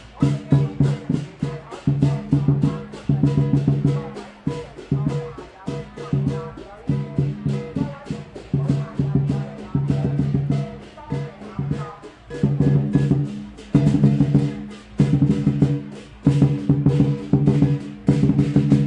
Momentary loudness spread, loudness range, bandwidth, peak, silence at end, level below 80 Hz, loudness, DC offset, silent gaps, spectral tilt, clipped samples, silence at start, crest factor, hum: 14 LU; 7 LU; 8.6 kHz; -2 dBFS; 0 s; -42 dBFS; -21 LUFS; under 0.1%; none; -9 dB/octave; under 0.1%; 0 s; 18 dB; none